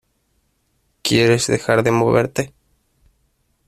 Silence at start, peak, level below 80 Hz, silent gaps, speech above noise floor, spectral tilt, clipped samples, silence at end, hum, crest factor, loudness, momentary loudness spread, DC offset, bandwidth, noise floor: 1.05 s; -2 dBFS; -52 dBFS; none; 50 dB; -5 dB/octave; under 0.1%; 1.2 s; none; 18 dB; -17 LUFS; 11 LU; under 0.1%; 15 kHz; -66 dBFS